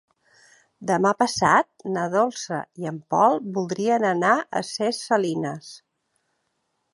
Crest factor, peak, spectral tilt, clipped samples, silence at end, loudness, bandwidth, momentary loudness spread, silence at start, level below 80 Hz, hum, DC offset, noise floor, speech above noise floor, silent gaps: 20 dB; -4 dBFS; -4.5 dB/octave; under 0.1%; 1.15 s; -23 LUFS; 11.5 kHz; 12 LU; 0.8 s; -64 dBFS; none; under 0.1%; -74 dBFS; 52 dB; none